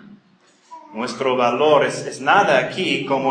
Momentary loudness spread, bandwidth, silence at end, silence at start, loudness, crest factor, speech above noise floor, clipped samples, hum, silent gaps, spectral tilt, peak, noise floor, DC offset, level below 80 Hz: 12 LU; 10 kHz; 0 s; 0.1 s; -18 LUFS; 18 dB; 38 dB; under 0.1%; none; none; -4 dB/octave; -2 dBFS; -56 dBFS; under 0.1%; -68 dBFS